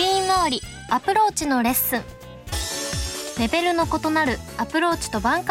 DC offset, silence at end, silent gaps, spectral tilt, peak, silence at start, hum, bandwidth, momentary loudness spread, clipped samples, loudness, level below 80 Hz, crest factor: under 0.1%; 0 s; none; -3 dB/octave; -6 dBFS; 0 s; none; 17 kHz; 9 LU; under 0.1%; -22 LUFS; -40 dBFS; 16 dB